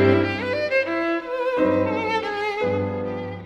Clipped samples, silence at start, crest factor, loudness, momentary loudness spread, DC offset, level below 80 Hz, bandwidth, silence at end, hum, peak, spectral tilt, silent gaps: under 0.1%; 0 s; 16 dB; -23 LUFS; 5 LU; under 0.1%; -56 dBFS; 9 kHz; 0 s; none; -6 dBFS; -7 dB/octave; none